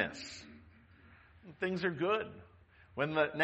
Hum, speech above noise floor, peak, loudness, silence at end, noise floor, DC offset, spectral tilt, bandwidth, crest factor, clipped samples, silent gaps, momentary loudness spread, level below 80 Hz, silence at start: none; 27 dB; -16 dBFS; -36 LUFS; 0 s; -61 dBFS; under 0.1%; -5.5 dB/octave; 8.4 kHz; 22 dB; under 0.1%; none; 24 LU; -68 dBFS; 0 s